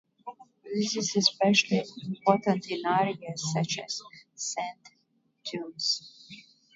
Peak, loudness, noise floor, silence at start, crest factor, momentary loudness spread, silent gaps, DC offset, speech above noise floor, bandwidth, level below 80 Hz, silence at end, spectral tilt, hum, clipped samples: -6 dBFS; -28 LUFS; -72 dBFS; 0.25 s; 24 dB; 22 LU; none; under 0.1%; 43 dB; 7.8 kHz; -76 dBFS; 0.35 s; -3.5 dB/octave; none; under 0.1%